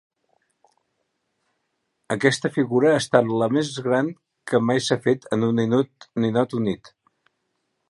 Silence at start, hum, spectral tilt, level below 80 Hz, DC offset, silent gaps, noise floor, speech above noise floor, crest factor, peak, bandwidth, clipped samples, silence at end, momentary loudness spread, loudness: 2.1 s; none; -5.5 dB/octave; -64 dBFS; under 0.1%; none; -75 dBFS; 54 dB; 22 dB; -2 dBFS; 11.5 kHz; under 0.1%; 1.15 s; 9 LU; -22 LUFS